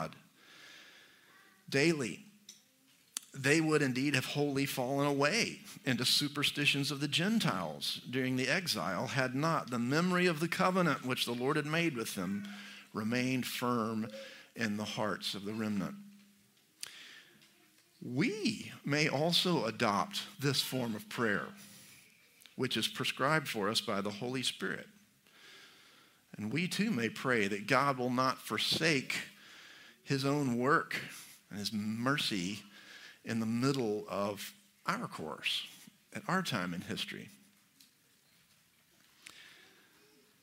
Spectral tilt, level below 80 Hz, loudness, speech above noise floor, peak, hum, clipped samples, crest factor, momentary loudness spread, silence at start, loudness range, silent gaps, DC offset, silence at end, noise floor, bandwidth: -4 dB/octave; -78 dBFS; -33 LUFS; 35 dB; -12 dBFS; none; under 0.1%; 24 dB; 18 LU; 0 s; 8 LU; none; under 0.1%; 0.9 s; -69 dBFS; 16 kHz